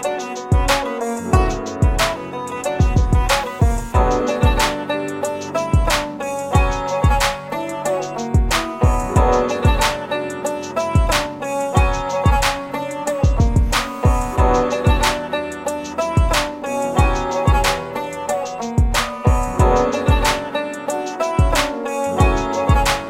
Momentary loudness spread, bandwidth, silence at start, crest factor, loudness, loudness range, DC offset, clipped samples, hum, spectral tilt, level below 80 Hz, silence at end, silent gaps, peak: 8 LU; 16.5 kHz; 0 s; 16 dB; -19 LUFS; 1 LU; under 0.1%; under 0.1%; none; -5 dB/octave; -22 dBFS; 0 s; none; -2 dBFS